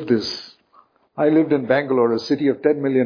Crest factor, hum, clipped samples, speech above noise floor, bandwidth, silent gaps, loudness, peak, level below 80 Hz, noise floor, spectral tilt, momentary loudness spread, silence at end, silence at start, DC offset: 16 dB; none; under 0.1%; 37 dB; 5.4 kHz; none; -19 LUFS; -4 dBFS; -64 dBFS; -56 dBFS; -6.5 dB/octave; 9 LU; 0 s; 0 s; under 0.1%